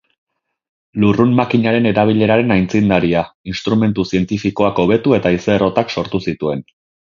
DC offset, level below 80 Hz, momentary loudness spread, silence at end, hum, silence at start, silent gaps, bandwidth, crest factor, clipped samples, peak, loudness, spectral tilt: under 0.1%; -44 dBFS; 8 LU; 0.55 s; none; 0.95 s; 3.35-3.44 s; 7.4 kHz; 16 dB; under 0.1%; 0 dBFS; -15 LUFS; -7.5 dB/octave